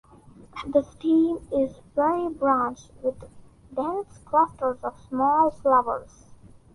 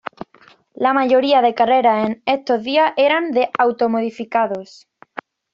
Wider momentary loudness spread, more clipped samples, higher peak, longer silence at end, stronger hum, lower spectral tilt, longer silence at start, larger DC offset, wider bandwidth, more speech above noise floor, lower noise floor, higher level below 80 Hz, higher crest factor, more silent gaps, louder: second, 11 LU vs 17 LU; neither; second, -8 dBFS vs -4 dBFS; about the same, 0.25 s vs 0.35 s; neither; first, -7 dB/octave vs -5.5 dB/octave; second, 0.55 s vs 0.8 s; neither; first, 11.5 kHz vs 7.4 kHz; second, 26 dB vs 34 dB; about the same, -50 dBFS vs -51 dBFS; first, -54 dBFS vs -64 dBFS; about the same, 16 dB vs 14 dB; neither; second, -25 LUFS vs -17 LUFS